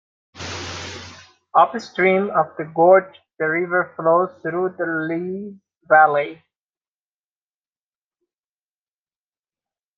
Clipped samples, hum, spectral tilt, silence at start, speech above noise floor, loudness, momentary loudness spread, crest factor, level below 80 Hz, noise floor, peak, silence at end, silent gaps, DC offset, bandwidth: under 0.1%; none; -5.5 dB/octave; 0.35 s; over 72 dB; -19 LUFS; 18 LU; 20 dB; -68 dBFS; under -90 dBFS; 0 dBFS; 3.65 s; none; under 0.1%; 7.6 kHz